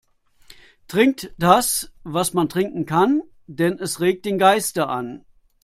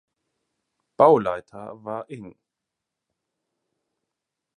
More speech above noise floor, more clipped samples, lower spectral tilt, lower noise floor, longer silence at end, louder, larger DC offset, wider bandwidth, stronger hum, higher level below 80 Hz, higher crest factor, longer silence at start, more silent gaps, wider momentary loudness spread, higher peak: second, 30 dB vs 63 dB; neither; second, -4.5 dB/octave vs -8 dB/octave; second, -50 dBFS vs -85 dBFS; second, 0.45 s vs 2.25 s; about the same, -20 LUFS vs -19 LUFS; neither; first, 16 kHz vs 10 kHz; neither; first, -54 dBFS vs -66 dBFS; about the same, 20 dB vs 24 dB; about the same, 0.9 s vs 1 s; neither; second, 9 LU vs 23 LU; about the same, 0 dBFS vs -2 dBFS